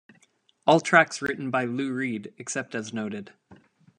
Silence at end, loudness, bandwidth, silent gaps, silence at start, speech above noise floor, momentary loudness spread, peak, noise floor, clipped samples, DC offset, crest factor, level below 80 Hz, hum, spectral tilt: 0.45 s; -25 LUFS; 11 kHz; none; 0.65 s; 39 dB; 14 LU; -2 dBFS; -64 dBFS; under 0.1%; under 0.1%; 26 dB; -70 dBFS; none; -4.5 dB/octave